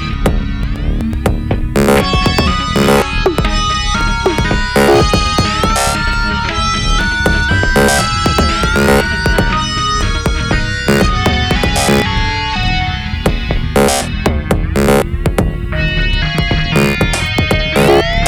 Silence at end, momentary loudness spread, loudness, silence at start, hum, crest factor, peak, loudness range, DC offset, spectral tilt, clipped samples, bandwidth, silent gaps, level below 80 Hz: 0 s; 6 LU; -13 LUFS; 0 s; none; 10 dB; -2 dBFS; 2 LU; under 0.1%; -4.5 dB/octave; under 0.1%; over 20 kHz; none; -18 dBFS